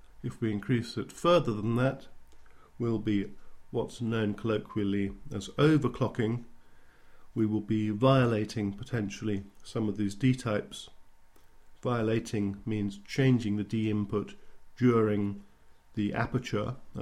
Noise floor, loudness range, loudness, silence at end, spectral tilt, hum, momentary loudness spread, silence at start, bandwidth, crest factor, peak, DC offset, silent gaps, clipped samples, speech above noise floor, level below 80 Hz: -53 dBFS; 4 LU; -30 LUFS; 0 s; -7 dB/octave; none; 12 LU; 0.05 s; 12.5 kHz; 20 dB; -12 dBFS; under 0.1%; none; under 0.1%; 24 dB; -54 dBFS